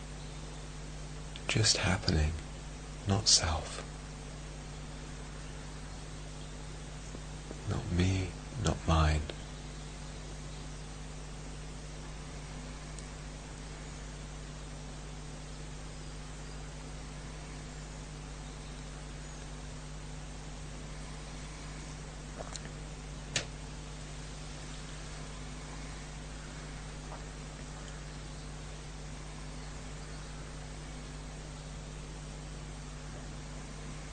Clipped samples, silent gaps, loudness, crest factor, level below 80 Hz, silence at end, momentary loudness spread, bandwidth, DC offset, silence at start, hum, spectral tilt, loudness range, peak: under 0.1%; none; -39 LUFS; 28 dB; -44 dBFS; 0 s; 14 LU; 9.6 kHz; under 0.1%; 0 s; none; -3.5 dB/octave; 13 LU; -12 dBFS